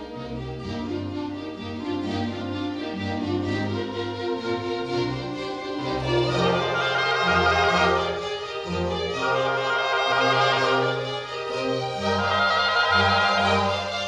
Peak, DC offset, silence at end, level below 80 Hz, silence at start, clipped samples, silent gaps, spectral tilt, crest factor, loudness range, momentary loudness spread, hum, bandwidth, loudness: -8 dBFS; under 0.1%; 0 s; -48 dBFS; 0 s; under 0.1%; none; -5 dB/octave; 16 dB; 7 LU; 11 LU; none; 12 kHz; -24 LUFS